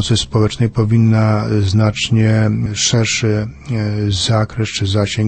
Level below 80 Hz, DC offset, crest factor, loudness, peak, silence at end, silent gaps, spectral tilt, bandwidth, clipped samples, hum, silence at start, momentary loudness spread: -38 dBFS; under 0.1%; 12 dB; -15 LUFS; -2 dBFS; 0 s; none; -5 dB/octave; 8.8 kHz; under 0.1%; none; 0 s; 6 LU